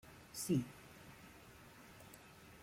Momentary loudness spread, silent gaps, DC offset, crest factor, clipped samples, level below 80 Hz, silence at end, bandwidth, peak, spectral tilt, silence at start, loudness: 20 LU; none; under 0.1%; 22 dB; under 0.1%; -70 dBFS; 0 s; 16.5 kHz; -24 dBFS; -5.5 dB/octave; 0.05 s; -41 LUFS